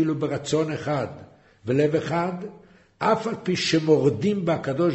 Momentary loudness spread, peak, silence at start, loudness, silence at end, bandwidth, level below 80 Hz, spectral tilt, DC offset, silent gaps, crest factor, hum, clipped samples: 10 LU; -6 dBFS; 0 s; -24 LUFS; 0 s; 8.2 kHz; -60 dBFS; -6 dB/octave; under 0.1%; none; 18 dB; none; under 0.1%